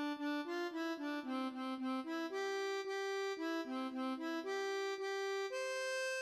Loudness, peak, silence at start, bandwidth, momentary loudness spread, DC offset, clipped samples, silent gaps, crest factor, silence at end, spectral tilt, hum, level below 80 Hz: -41 LUFS; -28 dBFS; 0 s; 15.5 kHz; 2 LU; under 0.1%; under 0.1%; none; 14 dB; 0 s; -1.5 dB/octave; none; under -90 dBFS